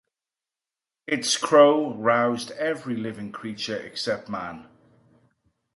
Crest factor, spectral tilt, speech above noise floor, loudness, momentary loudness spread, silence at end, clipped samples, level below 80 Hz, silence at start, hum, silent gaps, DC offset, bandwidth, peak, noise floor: 22 dB; -3.5 dB/octave; over 67 dB; -23 LUFS; 18 LU; 1.1 s; under 0.1%; -68 dBFS; 1.1 s; none; none; under 0.1%; 11.5 kHz; -4 dBFS; under -90 dBFS